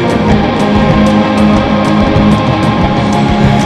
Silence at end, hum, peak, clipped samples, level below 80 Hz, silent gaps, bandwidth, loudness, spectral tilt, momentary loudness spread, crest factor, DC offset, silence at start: 0 s; none; 0 dBFS; 0.3%; -22 dBFS; none; 10.5 kHz; -9 LUFS; -7 dB/octave; 2 LU; 8 dB; under 0.1%; 0 s